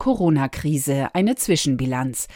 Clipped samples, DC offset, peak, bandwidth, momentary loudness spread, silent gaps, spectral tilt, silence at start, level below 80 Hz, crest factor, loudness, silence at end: under 0.1%; under 0.1%; -6 dBFS; 17 kHz; 4 LU; none; -5 dB/octave; 0 s; -44 dBFS; 14 dB; -21 LUFS; 0 s